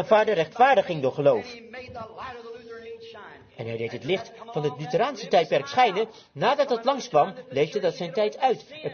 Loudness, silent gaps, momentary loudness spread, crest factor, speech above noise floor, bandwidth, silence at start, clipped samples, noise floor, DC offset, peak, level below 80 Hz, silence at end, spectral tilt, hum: -24 LUFS; none; 20 LU; 20 dB; 21 dB; 6.8 kHz; 0 s; under 0.1%; -45 dBFS; under 0.1%; -6 dBFS; -68 dBFS; 0 s; -5 dB/octave; none